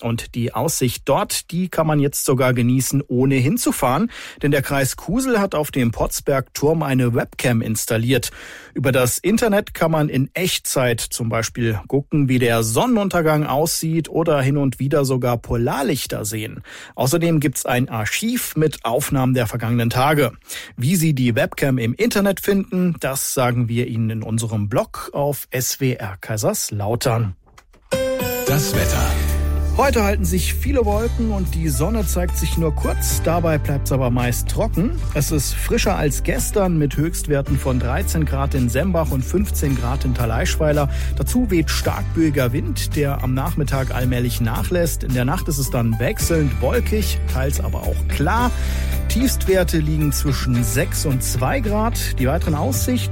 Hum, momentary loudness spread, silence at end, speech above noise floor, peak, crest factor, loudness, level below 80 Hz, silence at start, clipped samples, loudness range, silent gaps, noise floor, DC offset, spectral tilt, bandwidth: none; 5 LU; 0 s; 31 dB; -6 dBFS; 12 dB; -20 LUFS; -28 dBFS; 0 s; under 0.1%; 2 LU; none; -49 dBFS; under 0.1%; -5.5 dB/octave; 16.5 kHz